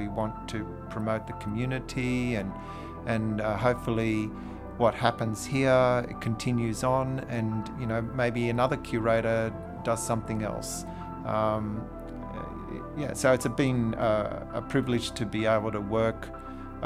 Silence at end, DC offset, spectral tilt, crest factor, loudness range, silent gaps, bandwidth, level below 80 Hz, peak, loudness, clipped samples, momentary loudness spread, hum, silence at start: 0 s; under 0.1%; -6 dB/octave; 22 dB; 5 LU; none; 15 kHz; -46 dBFS; -8 dBFS; -29 LUFS; under 0.1%; 13 LU; none; 0 s